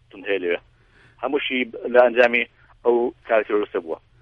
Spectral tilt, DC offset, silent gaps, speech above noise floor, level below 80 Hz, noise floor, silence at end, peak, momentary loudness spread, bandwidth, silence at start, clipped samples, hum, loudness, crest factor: -5.5 dB/octave; under 0.1%; none; 34 dB; -60 dBFS; -54 dBFS; 0.25 s; -2 dBFS; 12 LU; 6.4 kHz; 0.15 s; under 0.1%; none; -21 LUFS; 20 dB